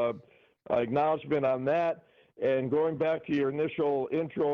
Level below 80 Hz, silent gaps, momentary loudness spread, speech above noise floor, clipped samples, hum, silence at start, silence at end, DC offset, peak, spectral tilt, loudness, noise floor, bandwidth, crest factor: -68 dBFS; none; 5 LU; 27 dB; under 0.1%; none; 0 s; 0 s; under 0.1%; -18 dBFS; -5.5 dB/octave; -29 LUFS; -56 dBFS; 6.4 kHz; 12 dB